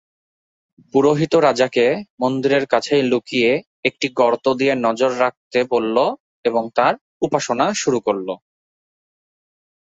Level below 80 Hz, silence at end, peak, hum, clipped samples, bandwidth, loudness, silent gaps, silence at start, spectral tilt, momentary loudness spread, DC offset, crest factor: -62 dBFS; 1.45 s; -2 dBFS; none; under 0.1%; 8 kHz; -18 LUFS; 2.10-2.18 s, 3.67-3.83 s, 5.37-5.51 s, 6.20-6.43 s, 7.01-7.20 s; 0.95 s; -4.5 dB/octave; 6 LU; under 0.1%; 16 dB